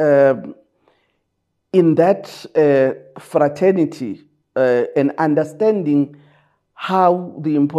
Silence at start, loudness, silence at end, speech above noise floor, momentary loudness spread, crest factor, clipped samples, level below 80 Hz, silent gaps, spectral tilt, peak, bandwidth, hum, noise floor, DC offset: 0 s; -17 LUFS; 0 s; 56 dB; 13 LU; 16 dB; under 0.1%; -70 dBFS; none; -8 dB/octave; -2 dBFS; 12.5 kHz; none; -72 dBFS; under 0.1%